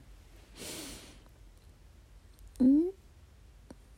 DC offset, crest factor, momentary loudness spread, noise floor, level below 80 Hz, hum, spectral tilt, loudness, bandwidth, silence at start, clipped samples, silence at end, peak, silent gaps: under 0.1%; 18 dB; 28 LU; -57 dBFS; -56 dBFS; none; -5 dB/octave; -30 LUFS; 16 kHz; 0.6 s; under 0.1%; 1.05 s; -16 dBFS; none